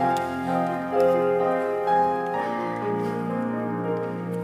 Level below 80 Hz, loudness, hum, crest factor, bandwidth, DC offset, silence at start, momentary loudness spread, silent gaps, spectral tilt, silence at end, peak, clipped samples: -68 dBFS; -25 LUFS; none; 14 dB; 16 kHz; under 0.1%; 0 s; 6 LU; none; -7.5 dB/octave; 0 s; -10 dBFS; under 0.1%